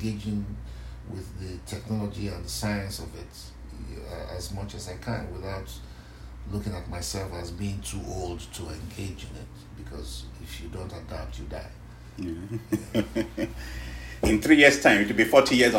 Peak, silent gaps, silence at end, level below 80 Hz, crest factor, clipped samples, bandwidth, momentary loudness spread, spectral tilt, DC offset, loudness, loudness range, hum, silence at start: -2 dBFS; none; 0 s; -42 dBFS; 26 dB; under 0.1%; 16 kHz; 23 LU; -4.5 dB/octave; under 0.1%; -27 LUFS; 15 LU; none; 0 s